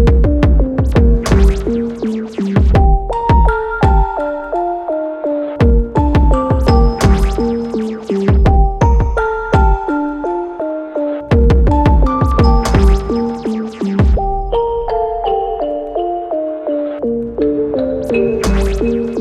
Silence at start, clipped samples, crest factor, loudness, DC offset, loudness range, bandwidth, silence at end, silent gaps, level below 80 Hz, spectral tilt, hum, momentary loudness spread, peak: 0 s; under 0.1%; 12 dB; -15 LUFS; under 0.1%; 4 LU; 10.5 kHz; 0 s; none; -16 dBFS; -8 dB/octave; none; 8 LU; 0 dBFS